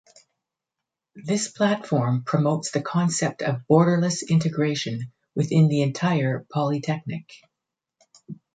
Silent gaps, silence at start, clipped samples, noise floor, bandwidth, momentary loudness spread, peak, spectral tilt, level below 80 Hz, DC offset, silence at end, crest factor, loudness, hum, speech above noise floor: none; 1.15 s; under 0.1%; -86 dBFS; 9.2 kHz; 13 LU; -4 dBFS; -6 dB/octave; -66 dBFS; under 0.1%; 0.2 s; 20 dB; -23 LUFS; none; 63 dB